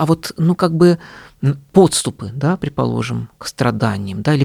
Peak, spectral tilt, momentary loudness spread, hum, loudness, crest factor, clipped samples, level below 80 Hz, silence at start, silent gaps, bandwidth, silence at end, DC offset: 0 dBFS; -6 dB/octave; 10 LU; none; -17 LUFS; 16 dB; under 0.1%; -46 dBFS; 0 s; none; 14.5 kHz; 0 s; under 0.1%